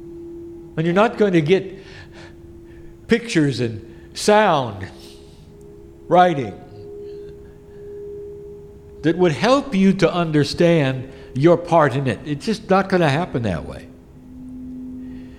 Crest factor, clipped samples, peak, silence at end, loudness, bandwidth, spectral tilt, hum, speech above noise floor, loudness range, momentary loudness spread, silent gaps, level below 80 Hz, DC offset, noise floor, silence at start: 18 dB; under 0.1%; -2 dBFS; 0 s; -18 LUFS; 13.5 kHz; -6.5 dB/octave; none; 25 dB; 6 LU; 22 LU; none; -46 dBFS; under 0.1%; -42 dBFS; 0 s